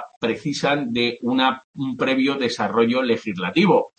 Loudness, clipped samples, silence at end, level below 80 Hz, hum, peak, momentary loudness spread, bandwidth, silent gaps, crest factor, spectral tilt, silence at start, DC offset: -21 LUFS; under 0.1%; 0.1 s; -64 dBFS; none; -4 dBFS; 6 LU; 8.8 kHz; 0.16-0.21 s, 1.64-1.73 s; 16 dB; -5.5 dB/octave; 0 s; under 0.1%